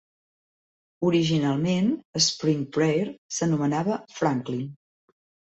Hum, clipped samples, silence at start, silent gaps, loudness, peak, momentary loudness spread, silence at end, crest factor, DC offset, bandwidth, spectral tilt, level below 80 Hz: none; under 0.1%; 1 s; 2.05-2.13 s, 3.18-3.29 s; -25 LUFS; -8 dBFS; 7 LU; 0.85 s; 18 dB; under 0.1%; 8.2 kHz; -5 dB/octave; -64 dBFS